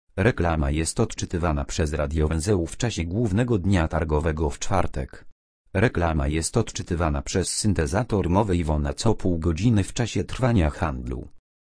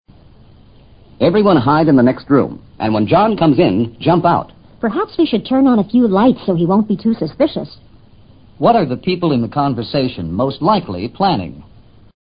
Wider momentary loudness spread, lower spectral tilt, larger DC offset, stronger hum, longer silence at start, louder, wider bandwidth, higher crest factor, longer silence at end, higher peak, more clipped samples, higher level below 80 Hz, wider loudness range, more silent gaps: second, 5 LU vs 8 LU; second, -5.5 dB/octave vs -12.5 dB/octave; second, under 0.1% vs 0.2%; neither; second, 0.15 s vs 1.2 s; second, -24 LUFS vs -15 LUFS; first, 10.5 kHz vs 5.2 kHz; about the same, 20 dB vs 16 dB; second, 0.35 s vs 0.7 s; second, -4 dBFS vs 0 dBFS; neither; first, -32 dBFS vs -44 dBFS; about the same, 2 LU vs 4 LU; first, 5.32-5.65 s vs none